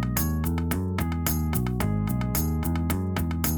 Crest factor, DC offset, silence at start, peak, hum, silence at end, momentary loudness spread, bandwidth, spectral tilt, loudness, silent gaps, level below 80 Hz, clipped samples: 16 dB; under 0.1%; 0 s; -10 dBFS; none; 0 s; 2 LU; over 20 kHz; -5.5 dB/octave; -27 LUFS; none; -34 dBFS; under 0.1%